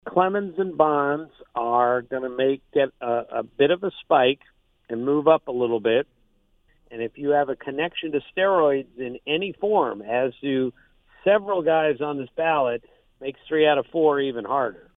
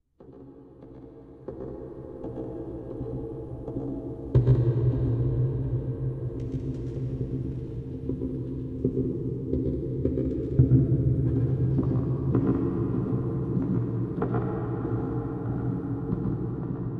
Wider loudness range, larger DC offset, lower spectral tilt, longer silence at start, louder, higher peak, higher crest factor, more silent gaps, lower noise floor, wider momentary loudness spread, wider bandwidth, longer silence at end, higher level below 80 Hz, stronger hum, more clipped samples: second, 2 LU vs 8 LU; neither; second, -8.5 dB/octave vs -12 dB/octave; second, 0.05 s vs 0.2 s; first, -23 LUFS vs -28 LUFS; first, -4 dBFS vs -8 dBFS; about the same, 20 dB vs 20 dB; neither; first, -63 dBFS vs -49 dBFS; second, 11 LU vs 14 LU; first, 3.9 kHz vs 2.7 kHz; first, 0.25 s vs 0 s; second, -62 dBFS vs -40 dBFS; neither; neither